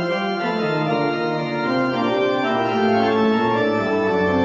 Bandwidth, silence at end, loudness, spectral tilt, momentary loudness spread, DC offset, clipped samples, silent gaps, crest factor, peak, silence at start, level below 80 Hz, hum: 7.6 kHz; 0 s; -20 LUFS; -7 dB/octave; 4 LU; under 0.1%; under 0.1%; none; 14 dB; -6 dBFS; 0 s; -58 dBFS; none